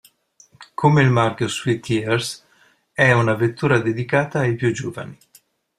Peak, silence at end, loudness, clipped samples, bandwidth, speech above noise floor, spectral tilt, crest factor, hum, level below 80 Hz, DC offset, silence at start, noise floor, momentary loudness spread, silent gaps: -2 dBFS; 0.65 s; -19 LUFS; under 0.1%; 13.5 kHz; 39 dB; -6 dB/octave; 18 dB; none; -56 dBFS; under 0.1%; 0.6 s; -58 dBFS; 16 LU; none